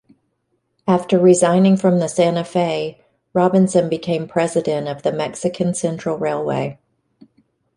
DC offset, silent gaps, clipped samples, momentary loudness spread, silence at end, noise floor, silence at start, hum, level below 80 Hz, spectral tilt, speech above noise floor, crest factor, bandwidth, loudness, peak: under 0.1%; none; under 0.1%; 10 LU; 1.05 s; -69 dBFS; 0.85 s; none; -60 dBFS; -6 dB/octave; 52 dB; 16 dB; 11.5 kHz; -18 LUFS; -2 dBFS